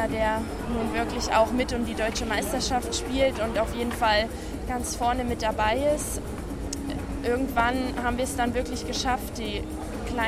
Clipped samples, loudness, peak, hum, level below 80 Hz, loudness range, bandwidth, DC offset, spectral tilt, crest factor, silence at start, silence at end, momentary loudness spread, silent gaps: under 0.1%; -27 LUFS; -10 dBFS; none; -38 dBFS; 2 LU; 15.5 kHz; under 0.1%; -4 dB/octave; 16 dB; 0 s; 0 s; 9 LU; none